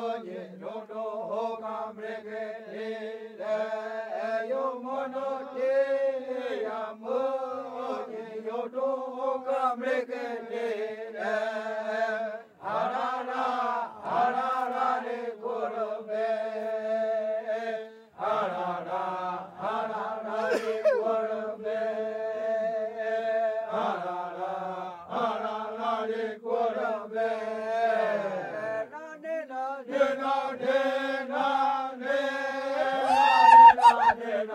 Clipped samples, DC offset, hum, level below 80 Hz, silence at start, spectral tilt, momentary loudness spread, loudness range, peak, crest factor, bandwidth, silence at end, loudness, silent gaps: under 0.1%; under 0.1%; none; -76 dBFS; 0 s; -4.5 dB/octave; 10 LU; 4 LU; -4 dBFS; 24 dB; 11 kHz; 0 s; -28 LUFS; none